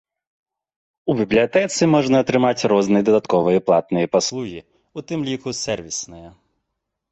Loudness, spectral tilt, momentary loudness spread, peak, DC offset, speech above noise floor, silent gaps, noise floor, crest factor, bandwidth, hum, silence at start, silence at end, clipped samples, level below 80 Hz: -19 LUFS; -5 dB/octave; 13 LU; -4 dBFS; under 0.1%; 60 dB; none; -78 dBFS; 16 dB; 8.4 kHz; none; 1.05 s; 0.8 s; under 0.1%; -54 dBFS